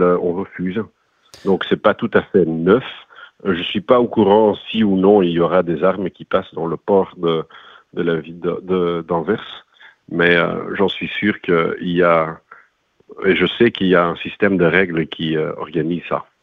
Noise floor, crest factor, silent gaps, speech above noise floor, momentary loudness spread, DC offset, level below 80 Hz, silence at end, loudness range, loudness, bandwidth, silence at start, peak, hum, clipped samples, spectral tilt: -56 dBFS; 18 dB; none; 39 dB; 11 LU; under 0.1%; -52 dBFS; 0.2 s; 5 LU; -17 LUFS; 6.4 kHz; 0 s; 0 dBFS; none; under 0.1%; -8 dB/octave